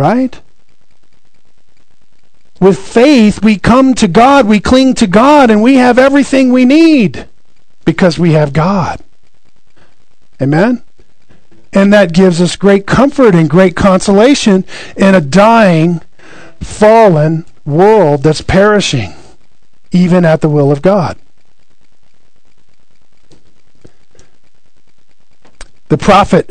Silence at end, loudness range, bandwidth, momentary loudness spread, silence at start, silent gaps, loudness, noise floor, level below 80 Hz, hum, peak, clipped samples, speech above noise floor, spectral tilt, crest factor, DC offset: 0 s; 8 LU; 12 kHz; 10 LU; 0 s; none; -8 LUFS; -57 dBFS; -34 dBFS; none; 0 dBFS; 4%; 50 dB; -6.5 dB/octave; 10 dB; 4%